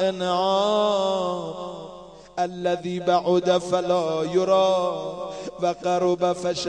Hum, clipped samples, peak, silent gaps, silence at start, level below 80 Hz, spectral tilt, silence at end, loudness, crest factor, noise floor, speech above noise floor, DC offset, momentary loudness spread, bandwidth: none; under 0.1%; -8 dBFS; none; 0 s; -62 dBFS; -5 dB/octave; 0 s; -23 LUFS; 16 dB; -43 dBFS; 21 dB; under 0.1%; 13 LU; 10 kHz